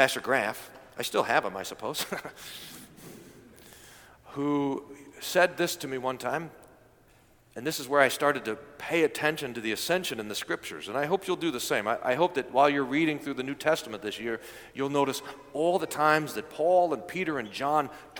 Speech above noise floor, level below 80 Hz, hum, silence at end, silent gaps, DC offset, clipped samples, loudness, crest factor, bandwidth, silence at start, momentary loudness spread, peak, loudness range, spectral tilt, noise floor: 31 dB; -66 dBFS; none; 0 s; none; under 0.1%; under 0.1%; -29 LUFS; 24 dB; 19 kHz; 0 s; 16 LU; -4 dBFS; 5 LU; -4 dB/octave; -60 dBFS